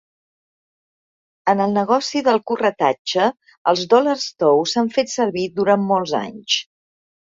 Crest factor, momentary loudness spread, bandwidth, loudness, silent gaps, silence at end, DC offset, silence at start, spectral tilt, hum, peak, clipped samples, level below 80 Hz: 18 dB; 5 LU; 7.8 kHz; -19 LUFS; 2.99-3.05 s, 3.57-3.65 s; 0.65 s; under 0.1%; 1.45 s; -4 dB/octave; none; -2 dBFS; under 0.1%; -64 dBFS